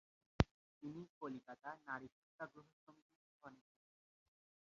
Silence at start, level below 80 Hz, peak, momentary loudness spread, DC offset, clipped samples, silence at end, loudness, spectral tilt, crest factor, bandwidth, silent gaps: 0.4 s; -58 dBFS; -14 dBFS; 22 LU; under 0.1%; under 0.1%; 1.15 s; -47 LUFS; -5.5 dB/octave; 36 dB; 7.2 kHz; 0.51-0.81 s, 1.09-1.21 s, 2.12-2.39 s, 2.73-2.87 s, 3.02-3.09 s, 3.16-3.40 s